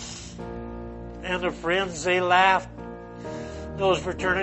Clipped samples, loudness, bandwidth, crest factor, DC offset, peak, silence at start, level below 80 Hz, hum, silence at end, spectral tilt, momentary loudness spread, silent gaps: under 0.1%; -24 LUFS; 8.4 kHz; 20 dB; under 0.1%; -6 dBFS; 0 s; -46 dBFS; none; 0 s; -4 dB/octave; 19 LU; none